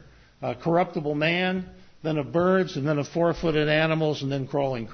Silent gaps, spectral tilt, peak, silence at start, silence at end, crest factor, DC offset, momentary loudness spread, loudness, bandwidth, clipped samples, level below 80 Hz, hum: none; -6.5 dB/octave; -8 dBFS; 0.4 s; 0 s; 16 dB; under 0.1%; 10 LU; -25 LUFS; 6.6 kHz; under 0.1%; -52 dBFS; none